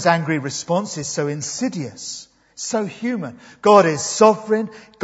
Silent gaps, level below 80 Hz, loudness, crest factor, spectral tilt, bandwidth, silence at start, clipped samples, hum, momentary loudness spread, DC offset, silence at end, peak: none; -64 dBFS; -19 LUFS; 20 dB; -4.5 dB/octave; 8 kHz; 0 s; under 0.1%; none; 17 LU; under 0.1%; 0.25 s; 0 dBFS